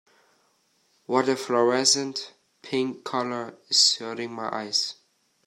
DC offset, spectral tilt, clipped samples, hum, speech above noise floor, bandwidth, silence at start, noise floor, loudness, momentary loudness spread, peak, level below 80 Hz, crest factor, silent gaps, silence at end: under 0.1%; -2 dB/octave; under 0.1%; none; 42 dB; 14 kHz; 1.1 s; -67 dBFS; -24 LUFS; 14 LU; -6 dBFS; -78 dBFS; 22 dB; none; 0.55 s